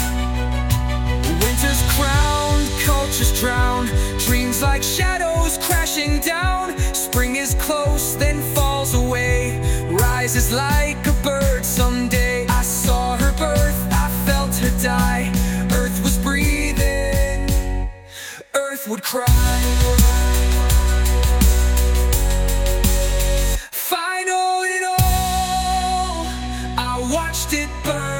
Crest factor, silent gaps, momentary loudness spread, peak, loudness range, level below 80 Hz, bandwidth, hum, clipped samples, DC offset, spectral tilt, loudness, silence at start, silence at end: 18 dB; none; 5 LU; 0 dBFS; 3 LU; -20 dBFS; 19 kHz; none; under 0.1%; under 0.1%; -4 dB/octave; -19 LUFS; 0 s; 0 s